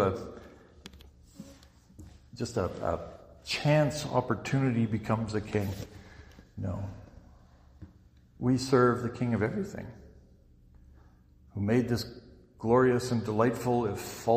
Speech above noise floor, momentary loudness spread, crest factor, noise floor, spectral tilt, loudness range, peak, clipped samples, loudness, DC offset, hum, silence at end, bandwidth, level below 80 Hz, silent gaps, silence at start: 29 dB; 25 LU; 20 dB; -58 dBFS; -6.5 dB/octave; 7 LU; -10 dBFS; under 0.1%; -30 LUFS; under 0.1%; none; 0 s; 15.5 kHz; -54 dBFS; none; 0 s